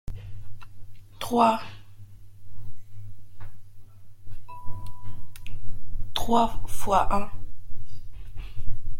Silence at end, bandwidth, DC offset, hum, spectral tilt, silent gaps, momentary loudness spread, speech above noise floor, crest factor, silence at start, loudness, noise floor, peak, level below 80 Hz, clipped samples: 0 s; 15 kHz; under 0.1%; none; -5.5 dB/octave; none; 26 LU; 23 dB; 14 dB; 0.1 s; -26 LUFS; -41 dBFS; -8 dBFS; -36 dBFS; under 0.1%